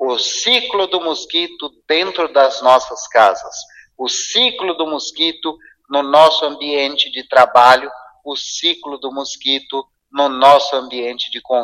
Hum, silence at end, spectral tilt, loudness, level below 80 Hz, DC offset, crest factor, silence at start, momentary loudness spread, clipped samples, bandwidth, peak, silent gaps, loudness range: none; 0 s; -1 dB/octave; -15 LUFS; -62 dBFS; under 0.1%; 16 dB; 0 s; 15 LU; under 0.1%; 14 kHz; 0 dBFS; none; 3 LU